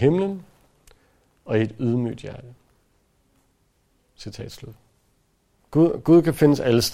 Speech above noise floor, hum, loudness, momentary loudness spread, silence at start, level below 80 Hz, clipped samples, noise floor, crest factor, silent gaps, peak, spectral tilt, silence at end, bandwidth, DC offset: 45 dB; none; -20 LUFS; 23 LU; 0 s; -52 dBFS; under 0.1%; -65 dBFS; 20 dB; none; -2 dBFS; -6.5 dB/octave; 0 s; 16 kHz; under 0.1%